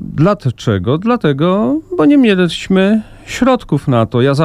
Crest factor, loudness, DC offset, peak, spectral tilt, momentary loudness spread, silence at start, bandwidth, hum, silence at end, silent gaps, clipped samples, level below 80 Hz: 12 dB; -13 LUFS; under 0.1%; 0 dBFS; -7 dB/octave; 6 LU; 0 s; 12 kHz; none; 0 s; none; under 0.1%; -40 dBFS